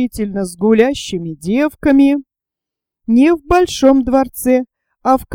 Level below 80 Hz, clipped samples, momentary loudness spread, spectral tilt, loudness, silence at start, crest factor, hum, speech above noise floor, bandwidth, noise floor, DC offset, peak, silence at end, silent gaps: -38 dBFS; under 0.1%; 10 LU; -5.5 dB/octave; -14 LUFS; 0 s; 14 dB; none; 72 dB; 17 kHz; -85 dBFS; under 0.1%; 0 dBFS; 0 s; none